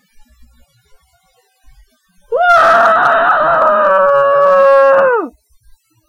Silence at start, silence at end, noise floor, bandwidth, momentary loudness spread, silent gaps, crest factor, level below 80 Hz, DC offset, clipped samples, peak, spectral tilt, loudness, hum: 2.3 s; 0.8 s; -56 dBFS; 10.5 kHz; 7 LU; none; 12 dB; -48 dBFS; under 0.1%; under 0.1%; -2 dBFS; -4 dB/octave; -9 LUFS; none